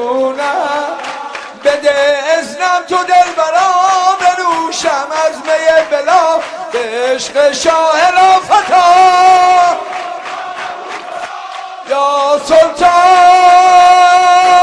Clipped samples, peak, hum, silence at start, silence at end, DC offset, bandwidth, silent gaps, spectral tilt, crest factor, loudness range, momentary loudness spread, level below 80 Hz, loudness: 0.9%; 0 dBFS; none; 0 s; 0 s; under 0.1%; 11 kHz; none; -1.5 dB/octave; 10 dB; 5 LU; 16 LU; -50 dBFS; -9 LUFS